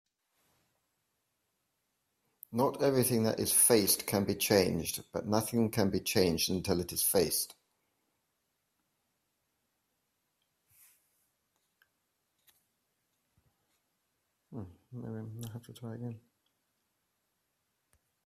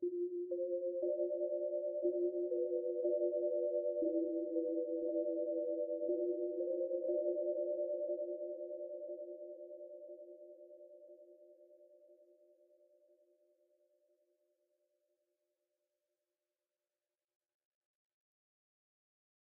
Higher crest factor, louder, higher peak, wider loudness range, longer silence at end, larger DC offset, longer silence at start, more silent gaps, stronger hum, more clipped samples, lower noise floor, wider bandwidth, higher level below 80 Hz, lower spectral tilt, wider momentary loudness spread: first, 26 dB vs 16 dB; first, -29 LUFS vs -39 LUFS; first, -10 dBFS vs -26 dBFS; first, 19 LU vs 16 LU; second, 2.1 s vs 7.35 s; neither; first, 2.5 s vs 0 s; neither; neither; neither; second, -81 dBFS vs under -90 dBFS; first, 16 kHz vs 0.8 kHz; first, -68 dBFS vs under -90 dBFS; first, -4 dB/octave vs 0 dB/octave; first, 20 LU vs 16 LU